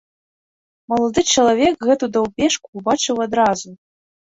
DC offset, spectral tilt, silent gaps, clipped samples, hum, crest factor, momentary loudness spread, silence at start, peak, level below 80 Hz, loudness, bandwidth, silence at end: under 0.1%; -3 dB/octave; 2.68-2.73 s; under 0.1%; none; 16 dB; 7 LU; 0.9 s; -2 dBFS; -50 dBFS; -18 LUFS; 8.2 kHz; 0.55 s